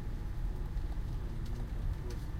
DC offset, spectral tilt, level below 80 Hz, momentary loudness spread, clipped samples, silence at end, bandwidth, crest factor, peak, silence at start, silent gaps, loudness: under 0.1%; -7 dB/octave; -38 dBFS; 1 LU; under 0.1%; 0 s; 14.5 kHz; 10 dB; -26 dBFS; 0 s; none; -41 LUFS